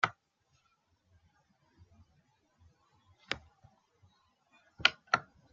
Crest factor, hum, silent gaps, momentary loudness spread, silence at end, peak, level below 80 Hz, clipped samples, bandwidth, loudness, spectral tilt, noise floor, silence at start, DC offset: 36 dB; none; none; 12 LU; 0.3 s; -6 dBFS; -72 dBFS; under 0.1%; 7.4 kHz; -33 LUFS; 1 dB/octave; -76 dBFS; 0.05 s; under 0.1%